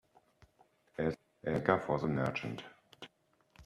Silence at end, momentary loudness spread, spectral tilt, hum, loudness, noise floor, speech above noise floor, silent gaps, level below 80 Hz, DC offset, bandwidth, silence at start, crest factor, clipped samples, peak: 0 s; 22 LU; -7.5 dB/octave; none; -35 LUFS; -71 dBFS; 36 dB; none; -64 dBFS; under 0.1%; 13 kHz; 1 s; 26 dB; under 0.1%; -12 dBFS